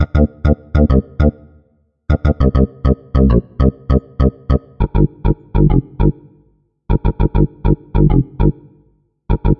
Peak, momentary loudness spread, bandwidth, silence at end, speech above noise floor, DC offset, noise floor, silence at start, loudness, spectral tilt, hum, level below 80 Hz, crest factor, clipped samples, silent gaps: 0 dBFS; 6 LU; 5.4 kHz; 0.05 s; 44 dB; 0.4%; -57 dBFS; 0 s; -16 LUFS; -11 dB/octave; none; -18 dBFS; 14 dB; under 0.1%; none